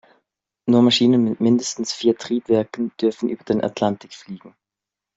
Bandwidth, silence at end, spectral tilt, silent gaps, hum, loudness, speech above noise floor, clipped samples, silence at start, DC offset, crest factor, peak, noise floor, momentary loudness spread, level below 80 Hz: 7.8 kHz; 0.7 s; -5 dB/octave; none; none; -20 LUFS; 67 dB; under 0.1%; 0.65 s; under 0.1%; 16 dB; -4 dBFS; -86 dBFS; 17 LU; -62 dBFS